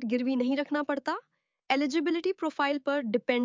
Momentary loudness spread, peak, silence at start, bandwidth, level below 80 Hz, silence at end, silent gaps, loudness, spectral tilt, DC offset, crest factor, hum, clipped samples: 4 LU; -10 dBFS; 0 s; 7.6 kHz; -78 dBFS; 0 s; none; -29 LUFS; -4.5 dB/octave; under 0.1%; 18 dB; none; under 0.1%